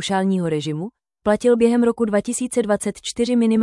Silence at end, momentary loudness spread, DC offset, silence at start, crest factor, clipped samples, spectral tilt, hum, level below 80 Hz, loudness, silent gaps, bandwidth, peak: 0 s; 10 LU; under 0.1%; 0 s; 14 dB; under 0.1%; -5.5 dB/octave; none; -54 dBFS; -20 LUFS; none; 12 kHz; -4 dBFS